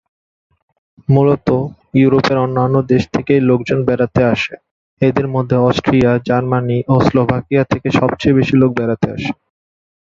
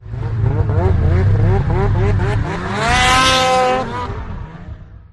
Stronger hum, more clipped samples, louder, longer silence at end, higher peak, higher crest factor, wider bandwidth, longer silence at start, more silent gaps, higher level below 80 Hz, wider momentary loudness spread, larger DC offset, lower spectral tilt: neither; neither; about the same, -14 LUFS vs -15 LUFS; first, 0.75 s vs 0.15 s; about the same, 0 dBFS vs -2 dBFS; about the same, 14 dB vs 14 dB; second, 7.4 kHz vs 12 kHz; first, 1.1 s vs 0 s; first, 4.71-4.97 s vs none; second, -42 dBFS vs -24 dBFS; second, 6 LU vs 17 LU; neither; first, -8 dB/octave vs -5 dB/octave